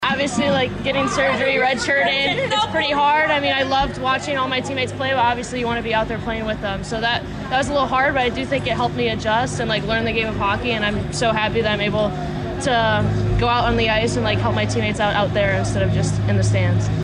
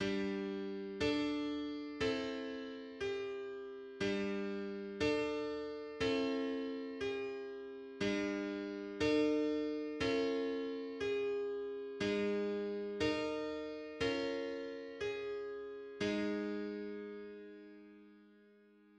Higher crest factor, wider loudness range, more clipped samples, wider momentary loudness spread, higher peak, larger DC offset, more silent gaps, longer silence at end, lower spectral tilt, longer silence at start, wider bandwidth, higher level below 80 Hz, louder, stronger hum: second, 10 dB vs 16 dB; about the same, 3 LU vs 5 LU; neither; second, 5 LU vs 11 LU; first, -8 dBFS vs -22 dBFS; neither; neither; second, 0 s vs 0.5 s; about the same, -5 dB/octave vs -5.5 dB/octave; about the same, 0 s vs 0 s; about the same, 10.5 kHz vs 9.8 kHz; first, -36 dBFS vs -66 dBFS; first, -19 LUFS vs -39 LUFS; neither